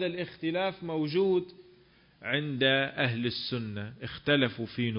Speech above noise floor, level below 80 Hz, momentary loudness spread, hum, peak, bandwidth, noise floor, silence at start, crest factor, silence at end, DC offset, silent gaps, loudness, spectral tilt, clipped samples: 30 dB; -64 dBFS; 12 LU; none; -12 dBFS; 5.4 kHz; -60 dBFS; 0 s; 20 dB; 0 s; under 0.1%; none; -30 LUFS; -9.5 dB/octave; under 0.1%